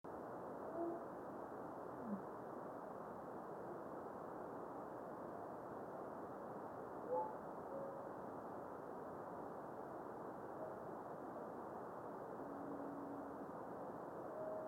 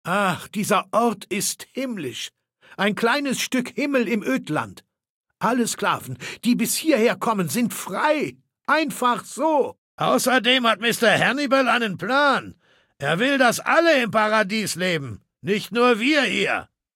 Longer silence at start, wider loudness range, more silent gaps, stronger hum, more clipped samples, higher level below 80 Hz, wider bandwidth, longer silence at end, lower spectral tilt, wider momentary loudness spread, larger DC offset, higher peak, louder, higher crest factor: about the same, 0.05 s vs 0.05 s; second, 2 LU vs 5 LU; second, none vs 5.10-5.24 s, 9.78-9.98 s; neither; neither; second, -82 dBFS vs -68 dBFS; about the same, 17 kHz vs 17 kHz; second, 0 s vs 0.3 s; first, -8 dB/octave vs -3.5 dB/octave; second, 4 LU vs 10 LU; neither; second, -32 dBFS vs -4 dBFS; second, -50 LUFS vs -21 LUFS; about the same, 18 dB vs 18 dB